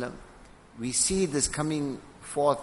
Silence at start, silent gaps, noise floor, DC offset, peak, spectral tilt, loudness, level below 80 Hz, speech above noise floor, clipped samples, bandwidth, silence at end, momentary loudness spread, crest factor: 0 s; none; -51 dBFS; under 0.1%; -10 dBFS; -3.5 dB/octave; -28 LUFS; -50 dBFS; 24 dB; under 0.1%; 11.5 kHz; 0 s; 14 LU; 18 dB